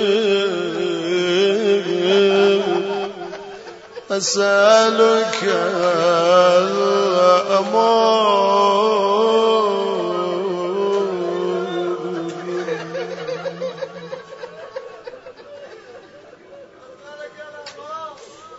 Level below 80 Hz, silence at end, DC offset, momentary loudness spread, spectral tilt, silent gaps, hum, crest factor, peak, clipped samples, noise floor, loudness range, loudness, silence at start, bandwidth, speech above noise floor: -68 dBFS; 0 s; under 0.1%; 21 LU; -4 dB/octave; none; none; 18 dB; 0 dBFS; under 0.1%; -43 dBFS; 21 LU; -17 LUFS; 0 s; 8 kHz; 28 dB